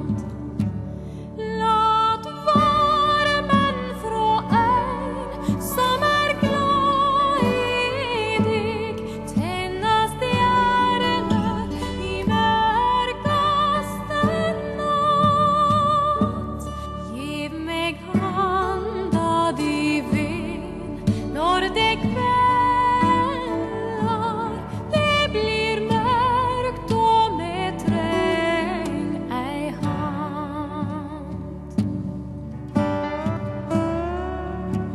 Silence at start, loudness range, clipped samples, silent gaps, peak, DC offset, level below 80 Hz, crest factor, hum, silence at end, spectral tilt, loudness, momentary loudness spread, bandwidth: 0 s; 6 LU; under 0.1%; none; -6 dBFS; under 0.1%; -40 dBFS; 16 dB; none; 0 s; -5.5 dB/octave; -22 LUFS; 11 LU; 13 kHz